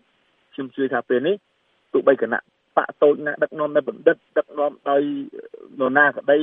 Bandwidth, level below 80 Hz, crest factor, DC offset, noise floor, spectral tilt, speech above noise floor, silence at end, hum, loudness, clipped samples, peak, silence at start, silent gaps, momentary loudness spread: 3.8 kHz; -78 dBFS; 20 dB; under 0.1%; -64 dBFS; -9 dB/octave; 44 dB; 0 s; none; -21 LUFS; under 0.1%; -2 dBFS; 0.6 s; none; 15 LU